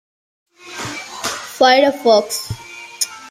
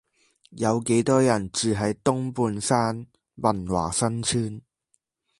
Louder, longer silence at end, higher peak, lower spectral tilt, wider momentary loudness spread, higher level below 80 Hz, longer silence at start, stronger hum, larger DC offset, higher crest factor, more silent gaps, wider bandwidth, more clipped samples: first, -16 LUFS vs -24 LUFS; second, 0 s vs 0.8 s; first, 0 dBFS vs -6 dBFS; second, -2.5 dB/octave vs -5 dB/octave; first, 18 LU vs 7 LU; about the same, -52 dBFS vs -52 dBFS; first, 0.65 s vs 0.5 s; neither; neither; about the same, 18 dB vs 20 dB; neither; first, 16 kHz vs 11.5 kHz; neither